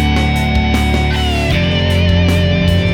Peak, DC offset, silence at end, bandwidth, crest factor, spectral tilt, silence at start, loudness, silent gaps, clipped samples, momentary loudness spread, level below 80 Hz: -2 dBFS; under 0.1%; 0 s; 16.5 kHz; 10 dB; -6 dB/octave; 0 s; -13 LUFS; none; under 0.1%; 2 LU; -18 dBFS